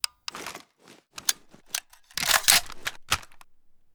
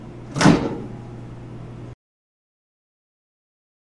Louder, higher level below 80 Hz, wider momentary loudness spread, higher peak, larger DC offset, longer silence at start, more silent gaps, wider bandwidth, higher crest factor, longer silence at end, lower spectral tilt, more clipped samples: second, -25 LUFS vs -19 LUFS; second, -52 dBFS vs -46 dBFS; about the same, 21 LU vs 22 LU; about the same, 0 dBFS vs 0 dBFS; neither; first, 0.35 s vs 0 s; neither; first, over 20 kHz vs 11.5 kHz; about the same, 28 dB vs 26 dB; second, 0.55 s vs 2 s; second, 1 dB/octave vs -5.5 dB/octave; neither